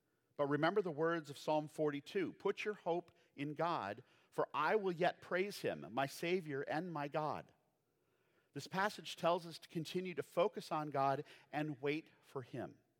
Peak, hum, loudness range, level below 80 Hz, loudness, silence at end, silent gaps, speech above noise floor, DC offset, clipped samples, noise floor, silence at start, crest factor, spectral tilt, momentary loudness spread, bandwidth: -20 dBFS; none; 3 LU; -90 dBFS; -40 LUFS; 0.25 s; none; 41 dB; under 0.1%; under 0.1%; -81 dBFS; 0.4 s; 20 dB; -5.5 dB/octave; 11 LU; 17.5 kHz